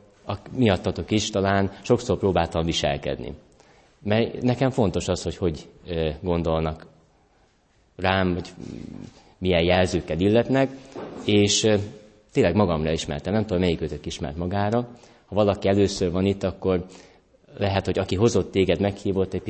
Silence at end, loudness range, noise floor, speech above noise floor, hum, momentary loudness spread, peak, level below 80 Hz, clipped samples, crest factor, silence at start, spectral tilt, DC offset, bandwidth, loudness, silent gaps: 0 s; 5 LU; -62 dBFS; 39 dB; none; 13 LU; -4 dBFS; -44 dBFS; under 0.1%; 20 dB; 0.25 s; -5.5 dB/octave; under 0.1%; 8.8 kHz; -24 LUFS; none